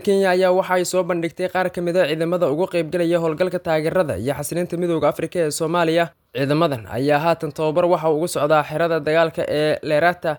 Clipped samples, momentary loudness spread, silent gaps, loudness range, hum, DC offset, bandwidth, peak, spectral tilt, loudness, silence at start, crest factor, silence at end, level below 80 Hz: under 0.1%; 5 LU; none; 2 LU; none; under 0.1%; 19.5 kHz; -4 dBFS; -5.5 dB/octave; -20 LUFS; 0 s; 16 dB; 0 s; -58 dBFS